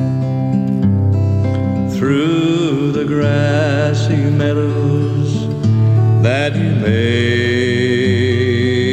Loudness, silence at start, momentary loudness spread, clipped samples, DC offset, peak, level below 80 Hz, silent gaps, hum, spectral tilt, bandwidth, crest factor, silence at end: -15 LUFS; 0 s; 4 LU; under 0.1%; under 0.1%; -2 dBFS; -44 dBFS; none; none; -7.5 dB/octave; 8.6 kHz; 12 dB; 0 s